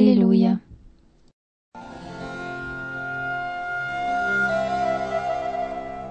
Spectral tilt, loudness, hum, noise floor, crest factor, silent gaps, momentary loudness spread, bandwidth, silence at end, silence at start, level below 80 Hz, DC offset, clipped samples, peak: -7.5 dB/octave; -24 LUFS; none; -52 dBFS; 20 dB; 1.33-1.72 s; 16 LU; 8.6 kHz; 0 s; 0 s; -52 dBFS; under 0.1%; under 0.1%; -4 dBFS